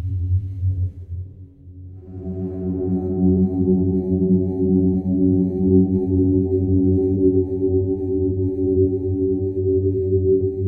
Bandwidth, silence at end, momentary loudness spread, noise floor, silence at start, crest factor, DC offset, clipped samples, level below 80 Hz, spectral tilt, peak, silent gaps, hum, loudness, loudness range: 1.1 kHz; 0 s; 10 LU; -40 dBFS; 0 s; 16 dB; under 0.1%; under 0.1%; -40 dBFS; -15 dB/octave; -4 dBFS; none; none; -20 LUFS; 5 LU